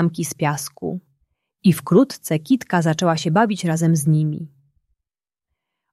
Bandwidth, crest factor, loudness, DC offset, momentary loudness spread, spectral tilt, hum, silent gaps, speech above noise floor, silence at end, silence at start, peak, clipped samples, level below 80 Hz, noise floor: 14.5 kHz; 16 dB; -19 LUFS; under 0.1%; 12 LU; -6 dB/octave; none; none; 71 dB; 1.45 s; 0 s; -4 dBFS; under 0.1%; -62 dBFS; -89 dBFS